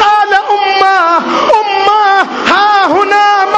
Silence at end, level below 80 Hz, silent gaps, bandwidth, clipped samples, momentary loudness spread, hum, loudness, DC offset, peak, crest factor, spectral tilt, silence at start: 0 s; -50 dBFS; none; 8.6 kHz; under 0.1%; 2 LU; none; -8 LUFS; under 0.1%; 0 dBFS; 8 dB; -2.5 dB/octave; 0 s